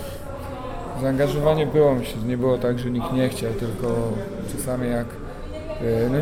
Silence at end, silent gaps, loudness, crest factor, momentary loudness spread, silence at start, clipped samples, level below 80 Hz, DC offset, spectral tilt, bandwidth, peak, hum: 0 s; none; -24 LUFS; 18 dB; 14 LU; 0 s; under 0.1%; -38 dBFS; under 0.1%; -7 dB/octave; 18 kHz; -6 dBFS; none